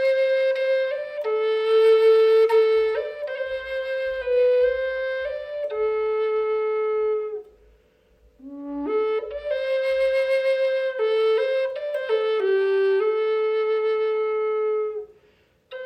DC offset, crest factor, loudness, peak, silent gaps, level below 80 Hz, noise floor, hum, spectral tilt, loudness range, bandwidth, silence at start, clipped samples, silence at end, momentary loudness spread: under 0.1%; 12 dB; -22 LUFS; -10 dBFS; none; -60 dBFS; -60 dBFS; none; -4 dB/octave; 7 LU; 8.6 kHz; 0 s; under 0.1%; 0 s; 12 LU